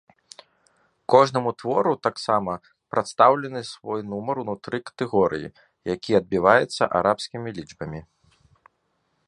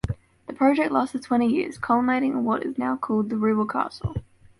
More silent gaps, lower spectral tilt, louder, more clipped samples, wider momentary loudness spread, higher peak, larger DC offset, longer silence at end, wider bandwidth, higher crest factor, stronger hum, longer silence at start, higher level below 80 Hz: neither; second, -5.5 dB/octave vs -7.5 dB/octave; about the same, -23 LUFS vs -24 LUFS; neither; first, 17 LU vs 11 LU; first, 0 dBFS vs -8 dBFS; neither; first, 1.25 s vs 0.4 s; about the same, 11 kHz vs 11.5 kHz; first, 24 dB vs 16 dB; neither; first, 1.1 s vs 0.05 s; second, -58 dBFS vs -48 dBFS